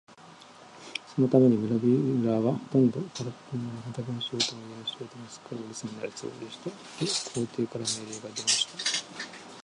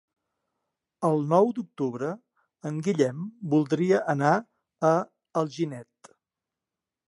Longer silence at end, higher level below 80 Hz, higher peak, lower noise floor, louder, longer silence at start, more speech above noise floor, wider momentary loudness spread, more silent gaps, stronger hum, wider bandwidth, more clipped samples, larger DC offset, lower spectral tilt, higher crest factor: second, 0 s vs 1.25 s; first, -70 dBFS vs -78 dBFS; about the same, -8 dBFS vs -8 dBFS; second, -51 dBFS vs -89 dBFS; about the same, -28 LUFS vs -26 LUFS; second, 0.1 s vs 1 s; second, 22 dB vs 63 dB; first, 16 LU vs 12 LU; neither; neither; about the same, 11.5 kHz vs 11.5 kHz; neither; neither; second, -4.5 dB/octave vs -7 dB/octave; about the same, 22 dB vs 20 dB